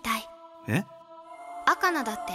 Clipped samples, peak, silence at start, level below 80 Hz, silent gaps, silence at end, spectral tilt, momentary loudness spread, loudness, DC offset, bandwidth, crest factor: under 0.1%; -6 dBFS; 0.05 s; -64 dBFS; none; 0 s; -4.5 dB/octave; 21 LU; -28 LUFS; under 0.1%; 16.5 kHz; 24 dB